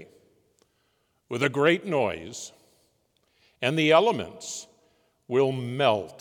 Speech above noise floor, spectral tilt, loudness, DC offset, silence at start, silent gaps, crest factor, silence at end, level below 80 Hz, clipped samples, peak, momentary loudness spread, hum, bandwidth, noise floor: 46 dB; -5 dB/octave; -25 LUFS; under 0.1%; 0 s; none; 22 dB; 0.1 s; -72 dBFS; under 0.1%; -6 dBFS; 17 LU; none; 17.5 kHz; -71 dBFS